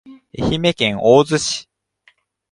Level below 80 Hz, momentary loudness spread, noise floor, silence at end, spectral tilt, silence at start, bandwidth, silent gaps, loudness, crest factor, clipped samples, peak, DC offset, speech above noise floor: -44 dBFS; 12 LU; -57 dBFS; 0.9 s; -4.5 dB/octave; 0.05 s; 11.5 kHz; none; -16 LUFS; 18 dB; under 0.1%; 0 dBFS; under 0.1%; 42 dB